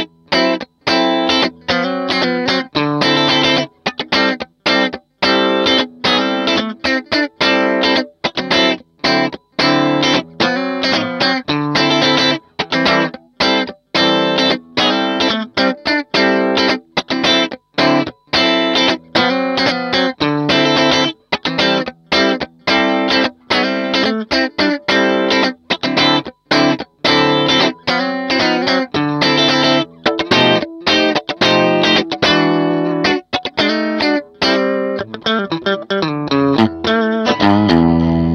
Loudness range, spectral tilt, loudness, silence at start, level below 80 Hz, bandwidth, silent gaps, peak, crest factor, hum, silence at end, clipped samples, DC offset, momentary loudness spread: 2 LU; -4.5 dB/octave; -14 LUFS; 0 s; -46 dBFS; 10.5 kHz; none; 0 dBFS; 16 dB; none; 0 s; under 0.1%; under 0.1%; 6 LU